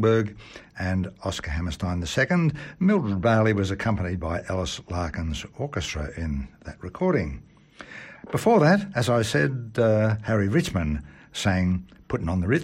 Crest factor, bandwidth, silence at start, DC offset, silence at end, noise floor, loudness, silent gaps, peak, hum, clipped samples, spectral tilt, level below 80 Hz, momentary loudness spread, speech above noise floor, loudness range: 18 dB; 15.5 kHz; 0 s; under 0.1%; 0 s; -45 dBFS; -25 LUFS; none; -8 dBFS; none; under 0.1%; -6.5 dB/octave; -40 dBFS; 13 LU; 20 dB; 7 LU